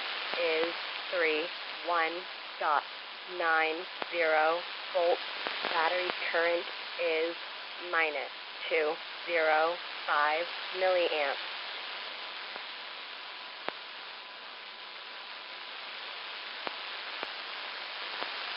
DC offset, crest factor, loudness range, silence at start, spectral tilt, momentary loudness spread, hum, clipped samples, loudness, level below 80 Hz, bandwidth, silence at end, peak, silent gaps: under 0.1%; 22 dB; 11 LU; 0 s; 2.5 dB/octave; 13 LU; none; under 0.1%; -32 LUFS; under -90 dBFS; 5.6 kHz; 0 s; -12 dBFS; none